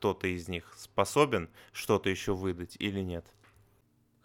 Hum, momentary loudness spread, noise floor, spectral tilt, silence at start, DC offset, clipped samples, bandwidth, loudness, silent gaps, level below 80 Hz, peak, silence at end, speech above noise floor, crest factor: none; 13 LU; -68 dBFS; -5 dB/octave; 0 s; under 0.1%; under 0.1%; 17 kHz; -32 LUFS; none; -58 dBFS; -10 dBFS; 1.05 s; 37 dB; 24 dB